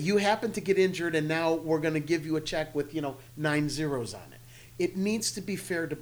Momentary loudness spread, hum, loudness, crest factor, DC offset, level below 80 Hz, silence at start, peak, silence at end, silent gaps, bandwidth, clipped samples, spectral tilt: 9 LU; none; -29 LUFS; 16 dB; under 0.1%; -56 dBFS; 0 s; -12 dBFS; 0 s; none; over 20 kHz; under 0.1%; -5 dB/octave